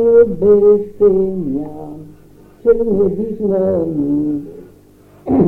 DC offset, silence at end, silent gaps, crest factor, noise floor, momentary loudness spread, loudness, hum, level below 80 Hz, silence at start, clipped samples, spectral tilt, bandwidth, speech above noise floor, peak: under 0.1%; 0 s; none; 14 dB; -45 dBFS; 20 LU; -15 LUFS; none; -40 dBFS; 0 s; under 0.1%; -11.5 dB/octave; 2.5 kHz; 31 dB; 0 dBFS